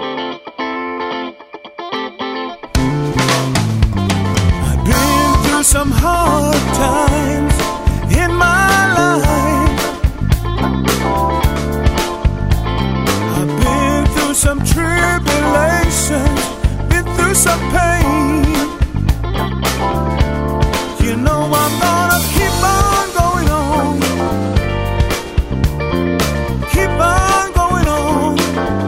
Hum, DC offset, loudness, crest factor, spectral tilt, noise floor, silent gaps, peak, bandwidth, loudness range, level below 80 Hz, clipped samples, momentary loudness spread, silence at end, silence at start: none; under 0.1%; -14 LUFS; 14 dB; -4.5 dB/octave; -34 dBFS; none; 0 dBFS; 16.5 kHz; 3 LU; -20 dBFS; under 0.1%; 7 LU; 0 s; 0 s